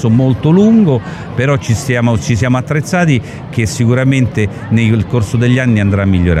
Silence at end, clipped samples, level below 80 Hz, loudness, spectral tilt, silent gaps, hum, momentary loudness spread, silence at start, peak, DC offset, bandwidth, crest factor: 0 s; under 0.1%; -34 dBFS; -12 LUFS; -7 dB/octave; none; none; 7 LU; 0 s; 0 dBFS; under 0.1%; 13 kHz; 10 dB